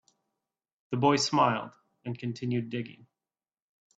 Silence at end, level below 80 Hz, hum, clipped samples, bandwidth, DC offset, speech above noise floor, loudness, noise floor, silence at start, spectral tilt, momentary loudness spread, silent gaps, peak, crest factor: 1.05 s; -72 dBFS; none; under 0.1%; 9 kHz; under 0.1%; over 61 dB; -29 LUFS; under -90 dBFS; 0.9 s; -5 dB/octave; 19 LU; none; -10 dBFS; 22 dB